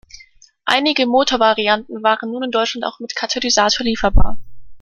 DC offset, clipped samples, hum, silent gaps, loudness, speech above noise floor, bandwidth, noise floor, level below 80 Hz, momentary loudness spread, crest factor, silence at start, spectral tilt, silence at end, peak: under 0.1%; under 0.1%; none; none; -17 LUFS; 32 dB; 8.8 kHz; -47 dBFS; -26 dBFS; 10 LU; 16 dB; 0.15 s; -3.5 dB/octave; 0 s; 0 dBFS